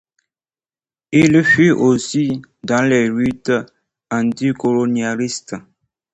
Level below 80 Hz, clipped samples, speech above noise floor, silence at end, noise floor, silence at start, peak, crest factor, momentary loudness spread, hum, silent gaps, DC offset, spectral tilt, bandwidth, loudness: -52 dBFS; under 0.1%; over 74 dB; 0.55 s; under -90 dBFS; 1.1 s; -2 dBFS; 16 dB; 12 LU; none; none; under 0.1%; -5.5 dB/octave; 8.8 kHz; -16 LUFS